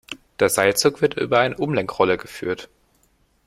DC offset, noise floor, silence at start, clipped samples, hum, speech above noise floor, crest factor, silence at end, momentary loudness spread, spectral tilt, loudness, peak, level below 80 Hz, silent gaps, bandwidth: under 0.1%; -62 dBFS; 0.1 s; under 0.1%; none; 42 dB; 20 dB; 0.8 s; 11 LU; -3.5 dB/octave; -20 LUFS; -2 dBFS; -56 dBFS; none; 16 kHz